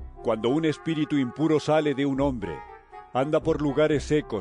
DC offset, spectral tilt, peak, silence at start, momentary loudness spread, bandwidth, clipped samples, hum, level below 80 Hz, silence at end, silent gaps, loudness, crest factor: under 0.1%; -6.5 dB/octave; -12 dBFS; 0 s; 9 LU; 10 kHz; under 0.1%; none; -46 dBFS; 0 s; none; -25 LUFS; 14 dB